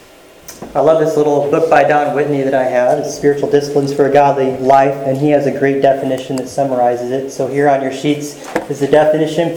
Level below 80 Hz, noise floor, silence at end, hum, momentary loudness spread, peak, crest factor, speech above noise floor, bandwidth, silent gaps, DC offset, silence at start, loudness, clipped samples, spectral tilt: -52 dBFS; -38 dBFS; 0 s; none; 8 LU; 0 dBFS; 14 dB; 25 dB; 18.5 kHz; none; under 0.1%; 0.5 s; -13 LUFS; under 0.1%; -6 dB/octave